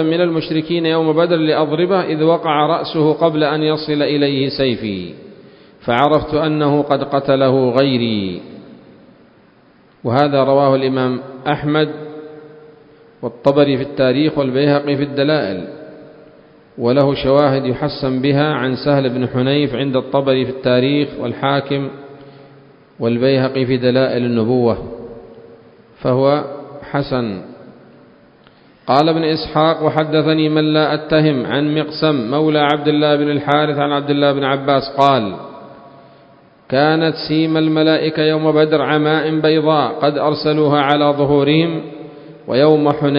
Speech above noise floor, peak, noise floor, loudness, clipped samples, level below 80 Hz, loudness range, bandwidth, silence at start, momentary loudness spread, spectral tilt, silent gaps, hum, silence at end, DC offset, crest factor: 35 dB; 0 dBFS; -49 dBFS; -15 LUFS; under 0.1%; -50 dBFS; 4 LU; 5.4 kHz; 0 s; 10 LU; -9 dB/octave; none; none; 0 s; under 0.1%; 16 dB